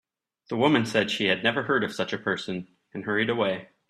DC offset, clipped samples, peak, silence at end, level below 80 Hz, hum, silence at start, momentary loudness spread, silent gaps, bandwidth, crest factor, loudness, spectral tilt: under 0.1%; under 0.1%; -8 dBFS; 0.25 s; -68 dBFS; none; 0.5 s; 12 LU; none; 13 kHz; 20 dB; -25 LUFS; -5 dB/octave